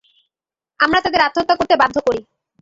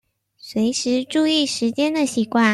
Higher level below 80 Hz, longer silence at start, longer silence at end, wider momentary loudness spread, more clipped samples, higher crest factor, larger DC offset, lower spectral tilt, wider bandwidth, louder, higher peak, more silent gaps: first, -50 dBFS vs -64 dBFS; first, 0.8 s vs 0.45 s; first, 0.4 s vs 0 s; about the same, 6 LU vs 4 LU; neither; about the same, 16 dB vs 16 dB; neither; about the same, -4 dB/octave vs -3.5 dB/octave; second, 7.8 kHz vs 13 kHz; first, -16 LUFS vs -20 LUFS; about the same, -2 dBFS vs -4 dBFS; neither